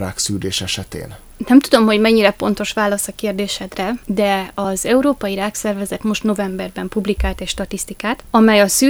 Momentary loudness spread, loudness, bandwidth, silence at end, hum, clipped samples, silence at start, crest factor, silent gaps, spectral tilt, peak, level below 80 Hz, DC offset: 11 LU; -17 LUFS; over 20 kHz; 0 s; none; under 0.1%; 0 s; 16 dB; none; -4 dB/octave; 0 dBFS; -36 dBFS; under 0.1%